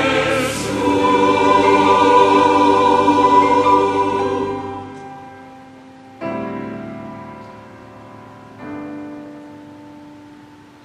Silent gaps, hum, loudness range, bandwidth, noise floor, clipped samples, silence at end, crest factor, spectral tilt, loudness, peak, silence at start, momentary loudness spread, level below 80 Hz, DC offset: none; none; 22 LU; 13.5 kHz; -42 dBFS; under 0.1%; 0.65 s; 16 dB; -5 dB/octave; -14 LUFS; 0 dBFS; 0 s; 22 LU; -50 dBFS; under 0.1%